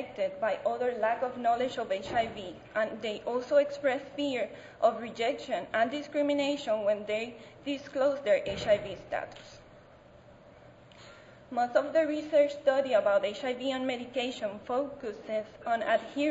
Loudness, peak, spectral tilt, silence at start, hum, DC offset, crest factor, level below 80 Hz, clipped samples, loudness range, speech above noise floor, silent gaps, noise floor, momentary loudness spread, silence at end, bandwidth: -31 LUFS; -12 dBFS; -4.5 dB/octave; 0 s; none; under 0.1%; 18 dB; -64 dBFS; under 0.1%; 4 LU; 25 dB; none; -55 dBFS; 10 LU; 0 s; 8 kHz